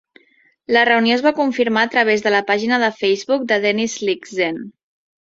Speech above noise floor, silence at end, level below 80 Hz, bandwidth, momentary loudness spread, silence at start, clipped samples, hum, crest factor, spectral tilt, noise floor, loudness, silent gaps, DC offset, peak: 40 dB; 0.6 s; -64 dBFS; 7.8 kHz; 8 LU; 0.7 s; under 0.1%; none; 16 dB; -3.5 dB/octave; -57 dBFS; -17 LUFS; none; under 0.1%; -2 dBFS